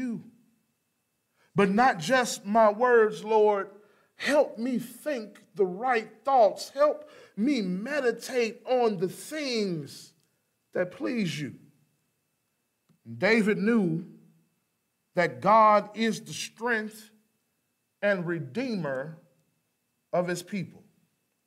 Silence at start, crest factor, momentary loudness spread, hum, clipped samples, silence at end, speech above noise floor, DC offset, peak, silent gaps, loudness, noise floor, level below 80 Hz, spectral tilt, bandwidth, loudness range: 0 s; 18 dB; 14 LU; none; under 0.1%; 0.75 s; 51 dB; under 0.1%; -10 dBFS; none; -27 LUFS; -77 dBFS; -76 dBFS; -5 dB/octave; 16 kHz; 9 LU